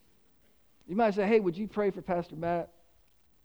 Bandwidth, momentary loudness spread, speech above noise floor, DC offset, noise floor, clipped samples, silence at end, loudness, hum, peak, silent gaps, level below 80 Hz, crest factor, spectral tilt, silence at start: over 20 kHz; 9 LU; 38 dB; under 0.1%; -68 dBFS; under 0.1%; 0.8 s; -30 LUFS; none; -14 dBFS; none; -62 dBFS; 18 dB; -8 dB/octave; 0.9 s